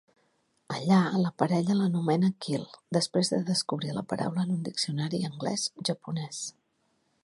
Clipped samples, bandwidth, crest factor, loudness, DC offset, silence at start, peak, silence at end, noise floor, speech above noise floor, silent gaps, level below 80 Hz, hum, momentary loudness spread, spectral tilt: under 0.1%; 11.5 kHz; 22 dB; -29 LUFS; under 0.1%; 0.7 s; -8 dBFS; 0.75 s; -73 dBFS; 45 dB; none; -72 dBFS; none; 9 LU; -5.5 dB/octave